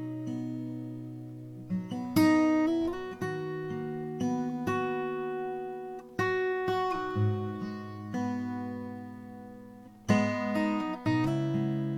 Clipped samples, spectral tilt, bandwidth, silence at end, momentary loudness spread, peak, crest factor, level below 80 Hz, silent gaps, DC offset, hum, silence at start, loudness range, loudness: under 0.1%; -7 dB/octave; 15.5 kHz; 0 s; 16 LU; -12 dBFS; 18 dB; -62 dBFS; none; under 0.1%; none; 0 s; 4 LU; -31 LUFS